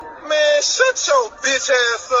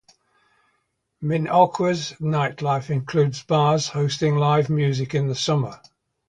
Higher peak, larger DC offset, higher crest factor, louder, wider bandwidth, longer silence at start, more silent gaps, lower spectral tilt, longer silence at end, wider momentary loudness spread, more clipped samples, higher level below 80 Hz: about the same, 0 dBFS vs -2 dBFS; neither; about the same, 16 dB vs 20 dB; first, -16 LUFS vs -22 LUFS; second, 8 kHz vs 9.4 kHz; second, 0 s vs 1.2 s; neither; second, 1.5 dB/octave vs -6 dB/octave; second, 0 s vs 0.55 s; about the same, 4 LU vs 6 LU; neither; about the same, -58 dBFS vs -58 dBFS